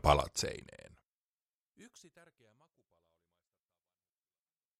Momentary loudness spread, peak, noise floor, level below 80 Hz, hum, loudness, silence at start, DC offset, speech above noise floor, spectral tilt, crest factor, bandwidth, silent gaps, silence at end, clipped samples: 28 LU; -12 dBFS; under -90 dBFS; -50 dBFS; none; -34 LUFS; 0.05 s; under 0.1%; over 54 dB; -4 dB/octave; 28 dB; 15.5 kHz; none; 4.2 s; under 0.1%